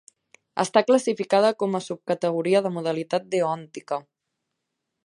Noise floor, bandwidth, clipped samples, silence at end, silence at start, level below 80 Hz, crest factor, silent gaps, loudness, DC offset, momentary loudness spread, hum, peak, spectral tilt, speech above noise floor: -81 dBFS; 11.5 kHz; under 0.1%; 1.05 s; 0.55 s; -76 dBFS; 20 dB; none; -24 LUFS; under 0.1%; 12 LU; none; -4 dBFS; -5 dB/octave; 58 dB